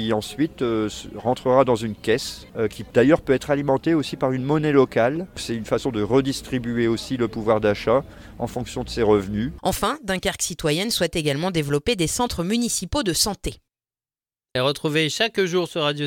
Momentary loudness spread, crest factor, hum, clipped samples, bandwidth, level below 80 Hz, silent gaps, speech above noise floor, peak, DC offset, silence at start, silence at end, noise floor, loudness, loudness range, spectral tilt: 10 LU; 18 dB; none; under 0.1%; 18 kHz; -44 dBFS; none; over 68 dB; -4 dBFS; under 0.1%; 0 s; 0 s; under -90 dBFS; -22 LUFS; 3 LU; -4.5 dB/octave